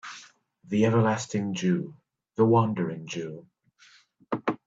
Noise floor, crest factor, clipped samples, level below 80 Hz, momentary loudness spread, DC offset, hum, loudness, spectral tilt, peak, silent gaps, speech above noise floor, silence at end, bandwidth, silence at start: -59 dBFS; 18 dB; under 0.1%; -68 dBFS; 19 LU; under 0.1%; none; -26 LUFS; -6.5 dB/octave; -10 dBFS; none; 34 dB; 0.1 s; 8 kHz; 0.05 s